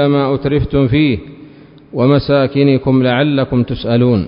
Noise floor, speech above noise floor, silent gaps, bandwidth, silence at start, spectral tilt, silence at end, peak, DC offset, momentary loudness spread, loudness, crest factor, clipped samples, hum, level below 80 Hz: -39 dBFS; 26 dB; none; 5.4 kHz; 0 s; -11.5 dB/octave; 0 s; 0 dBFS; under 0.1%; 4 LU; -13 LUFS; 12 dB; under 0.1%; none; -34 dBFS